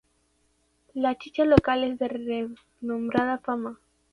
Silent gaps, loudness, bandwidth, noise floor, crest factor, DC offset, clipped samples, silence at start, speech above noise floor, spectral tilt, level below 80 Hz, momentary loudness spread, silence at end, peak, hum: none; -26 LUFS; 11 kHz; -69 dBFS; 24 dB; under 0.1%; under 0.1%; 0.95 s; 43 dB; -8 dB/octave; -50 dBFS; 16 LU; 0.35 s; -4 dBFS; none